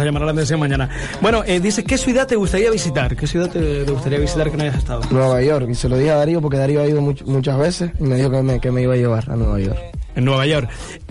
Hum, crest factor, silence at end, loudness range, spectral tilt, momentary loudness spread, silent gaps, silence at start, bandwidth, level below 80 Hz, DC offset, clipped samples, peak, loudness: none; 10 dB; 0 s; 1 LU; -6 dB/octave; 5 LU; none; 0 s; 11.5 kHz; -28 dBFS; 0.2%; under 0.1%; -6 dBFS; -18 LUFS